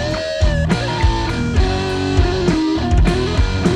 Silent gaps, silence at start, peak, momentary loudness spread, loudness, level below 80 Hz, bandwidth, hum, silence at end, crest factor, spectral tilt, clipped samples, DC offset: none; 0 s; -2 dBFS; 3 LU; -17 LUFS; -20 dBFS; 10.5 kHz; none; 0 s; 14 dB; -6 dB/octave; under 0.1%; under 0.1%